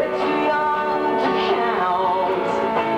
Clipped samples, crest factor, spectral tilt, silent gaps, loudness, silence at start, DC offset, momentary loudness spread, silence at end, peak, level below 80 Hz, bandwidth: under 0.1%; 12 dB; -5.5 dB/octave; none; -20 LUFS; 0 s; under 0.1%; 1 LU; 0 s; -8 dBFS; -56 dBFS; 10.5 kHz